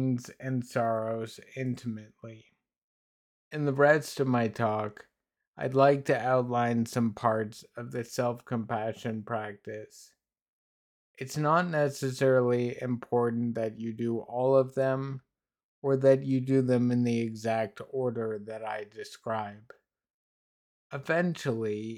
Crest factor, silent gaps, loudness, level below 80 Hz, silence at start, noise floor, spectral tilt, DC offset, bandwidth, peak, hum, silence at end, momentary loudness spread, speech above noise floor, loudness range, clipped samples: 20 dB; 2.83-3.51 s, 5.47-5.53 s, 10.42-11.14 s, 15.63-15.82 s, 20.10-20.90 s; -29 LUFS; -74 dBFS; 0 s; under -90 dBFS; -7 dB/octave; under 0.1%; 16 kHz; -10 dBFS; none; 0 s; 15 LU; over 61 dB; 8 LU; under 0.1%